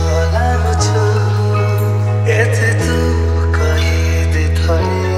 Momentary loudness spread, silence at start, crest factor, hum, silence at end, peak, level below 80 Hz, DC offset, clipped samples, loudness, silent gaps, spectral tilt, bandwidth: 2 LU; 0 s; 12 dB; none; 0 s; 0 dBFS; -20 dBFS; under 0.1%; under 0.1%; -14 LUFS; none; -6 dB/octave; 13 kHz